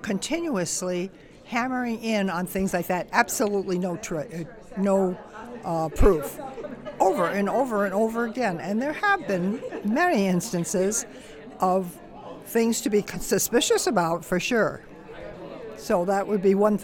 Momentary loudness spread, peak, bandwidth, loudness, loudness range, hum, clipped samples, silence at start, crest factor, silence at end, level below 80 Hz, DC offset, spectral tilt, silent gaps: 16 LU; -4 dBFS; 18 kHz; -25 LUFS; 2 LU; none; under 0.1%; 0 s; 22 dB; 0 s; -40 dBFS; under 0.1%; -4.5 dB/octave; none